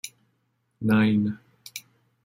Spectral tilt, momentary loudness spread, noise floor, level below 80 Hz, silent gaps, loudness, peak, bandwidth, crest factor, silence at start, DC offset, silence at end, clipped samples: -6 dB/octave; 20 LU; -72 dBFS; -66 dBFS; none; -24 LUFS; -10 dBFS; 16.5 kHz; 18 dB; 0.05 s; under 0.1%; 0.45 s; under 0.1%